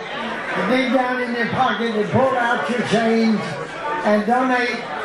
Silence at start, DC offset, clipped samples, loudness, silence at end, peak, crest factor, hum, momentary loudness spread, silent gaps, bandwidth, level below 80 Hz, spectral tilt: 0 s; under 0.1%; under 0.1%; -19 LUFS; 0 s; -4 dBFS; 16 dB; none; 7 LU; none; 11.5 kHz; -58 dBFS; -5.5 dB/octave